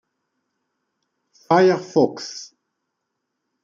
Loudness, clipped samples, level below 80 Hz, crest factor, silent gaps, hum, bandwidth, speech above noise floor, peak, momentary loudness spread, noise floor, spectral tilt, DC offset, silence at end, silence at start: -18 LUFS; under 0.1%; -74 dBFS; 20 dB; none; none; 7.6 kHz; 60 dB; -2 dBFS; 17 LU; -78 dBFS; -5.5 dB/octave; under 0.1%; 1.2 s; 1.5 s